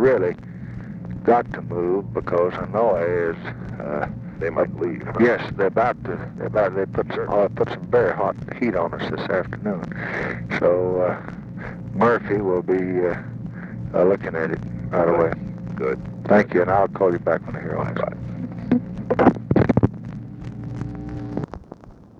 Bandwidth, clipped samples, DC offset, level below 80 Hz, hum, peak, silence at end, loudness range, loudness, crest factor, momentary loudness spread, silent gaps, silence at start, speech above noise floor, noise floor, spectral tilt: 7.2 kHz; under 0.1%; under 0.1%; -46 dBFS; none; 0 dBFS; 0.25 s; 2 LU; -22 LUFS; 22 dB; 14 LU; none; 0 s; 21 dB; -43 dBFS; -9 dB/octave